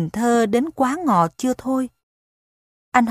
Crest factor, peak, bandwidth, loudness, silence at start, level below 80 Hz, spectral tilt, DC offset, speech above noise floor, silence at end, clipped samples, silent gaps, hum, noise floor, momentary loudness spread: 20 dB; 0 dBFS; 15.5 kHz; -20 LUFS; 0 s; -58 dBFS; -6 dB/octave; under 0.1%; over 70 dB; 0 s; under 0.1%; 2.03-2.92 s; none; under -90 dBFS; 6 LU